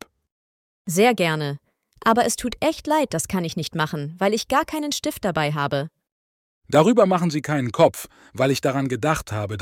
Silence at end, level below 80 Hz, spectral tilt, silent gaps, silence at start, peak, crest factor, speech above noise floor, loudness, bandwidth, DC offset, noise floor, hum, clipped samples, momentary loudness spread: 0 s; -52 dBFS; -5 dB/octave; 6.12-6.62 s; 0.85 s; -4 dBFS; 18 dB; over 69 dB; -22 LUFS; 17 kHz; under 0.1%; under -90 dBFS; none; under 0.1%; 9 LU